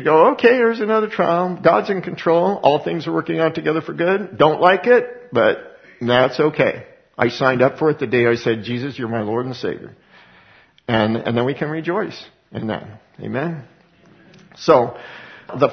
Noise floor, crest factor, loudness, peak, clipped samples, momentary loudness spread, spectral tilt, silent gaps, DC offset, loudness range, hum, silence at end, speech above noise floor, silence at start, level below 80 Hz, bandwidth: -51 dBFS; 18 dB; -18 LUFS; 0 dBFS; under 0.1%; 15 LU; -7 dB/octave; none; under 0.1%; 6 LU; none; 0 s; 33 dB; 0 s; -58 dBFS; 6.4 kHz